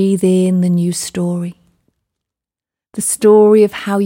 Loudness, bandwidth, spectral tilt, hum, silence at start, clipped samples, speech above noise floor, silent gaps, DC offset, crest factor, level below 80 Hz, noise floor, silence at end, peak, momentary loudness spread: -13 LUFS; 17 kHz; -6 dB/octave; none; 0 s; under 0.1%; 76 dB; none; under 0.1%; 14 dB; -58 dBFS; -88 dBFS; 0 s; 0 dBFS; 13 LU